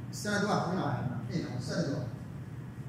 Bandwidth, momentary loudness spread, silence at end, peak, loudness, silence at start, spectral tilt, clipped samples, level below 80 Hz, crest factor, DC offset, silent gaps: 16 kHz; 13 LU; 0 s; -18 dBFS; -34 LUFS; 0 s; -6 dB/octave; under 0.1%; -60 dBFS; 16 dB; under 0.1%; none